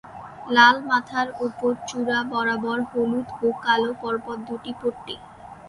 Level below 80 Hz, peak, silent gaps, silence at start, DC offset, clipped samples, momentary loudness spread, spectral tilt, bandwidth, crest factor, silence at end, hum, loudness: -60 dBFS; -2 dBFS; none; 0.05 s; under 0.1%; under 0.1%; 20 LU; -4 dB/octave; 11.5 kHz; 22 dB; 0 s; none; -23 LUFS